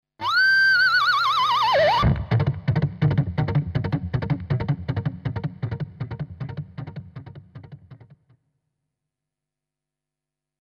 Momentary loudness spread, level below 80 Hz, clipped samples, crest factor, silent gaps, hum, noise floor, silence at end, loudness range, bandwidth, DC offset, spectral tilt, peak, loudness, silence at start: 18 LU; -42 dBFS; under 0.1%; 16 dB; none; none; -87 dBFS; 2.7 s; 20 LU; 14.5 kHz; under 0.1%; -6 dB/octave; -8 dBFS; -21 LUFS; 0.2 s